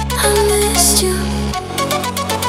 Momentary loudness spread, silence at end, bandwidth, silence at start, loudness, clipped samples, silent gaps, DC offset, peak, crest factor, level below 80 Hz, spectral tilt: 9 LU; 0 s; 17 kHz; 0 s; -14 LUFS; under 0.1%; none; under 0.1%; 0 dBFS; 16 dB; -26 dBFS; -3 dB/octave